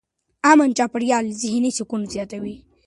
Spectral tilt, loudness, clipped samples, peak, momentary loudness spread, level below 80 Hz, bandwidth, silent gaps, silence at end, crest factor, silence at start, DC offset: -4 dB/octave; -20 LUFS; under 0.1%; 0 dBFS; 15 LU; -58 dBFS; 11.5 kHz; none; 0.3 s; 20 dB; 0.45 s; under 0.1%